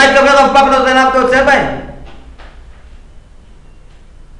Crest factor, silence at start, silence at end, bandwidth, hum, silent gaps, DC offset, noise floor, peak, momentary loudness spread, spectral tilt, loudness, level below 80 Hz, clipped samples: 12 dB; 0 s; 1.2 s; 11 kHz; none; none; under 0.1%; -37 dBFS; 0 dBFS; 14 LU; -3.5 dB/octave; -9 LUFS; -34 dBFS; under 0.1%